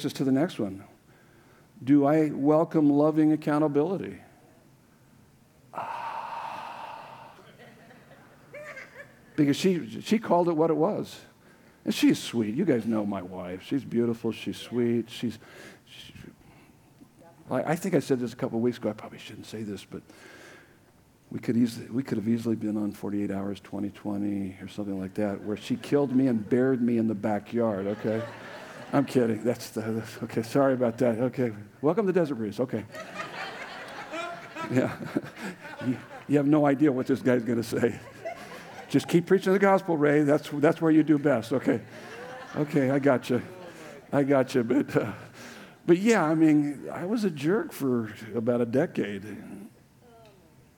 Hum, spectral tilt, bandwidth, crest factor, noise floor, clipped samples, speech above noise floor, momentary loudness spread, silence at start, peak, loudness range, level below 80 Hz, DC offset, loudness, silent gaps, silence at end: none; -6.5 dB/octave; 18.5 kHz; 20 dB; -59 dBFS; under 0.1%; 33 dB; 19 LU; 0 s; -8 dBFS; 9 LU; -70 dBFS; under 0.1%; -27 LUFS; none; 1.1 s